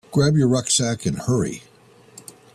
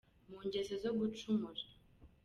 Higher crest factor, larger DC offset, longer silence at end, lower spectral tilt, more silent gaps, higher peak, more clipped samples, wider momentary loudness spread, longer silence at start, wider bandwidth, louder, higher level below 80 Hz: about the same, 16 dB vs 16 dB; neither; first, 0.95 s vs 0.2 s; about the same, -5 dB/octave vs -6 dB/octave; neither; first, -6 dBFS vs -26 dBFS; neither; first, 24 LU vs 12 LU; second, 0.1 s vs 0.3 s; first, 13.5 kHz vs 11.5 kHz; first, -20 LUFS vs -40 LUFS; first, -52 dBFS vs -68 dBFS